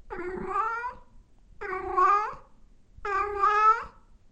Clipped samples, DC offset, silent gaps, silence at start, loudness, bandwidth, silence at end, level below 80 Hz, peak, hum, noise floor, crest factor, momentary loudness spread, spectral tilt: under 0.1%; under 0.1%; none; 0.05 s; -26 LUFS; 8.4 kHz; 0.45 s; -52 dBFS; -12 dBFS; none; -54 dBFS; 16 dB; 17 LU; -5 dB/octave